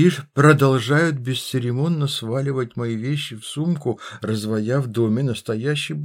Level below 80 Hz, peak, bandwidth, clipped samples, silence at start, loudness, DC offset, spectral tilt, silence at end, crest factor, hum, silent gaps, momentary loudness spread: -68 dBFS; -2 dBFS; 16.5 kHz; under 0.1%; 0 s; -21 LUFS; under 0.1%; -6 dB/octave; 0 s; 18 dB; none; none; 9 LU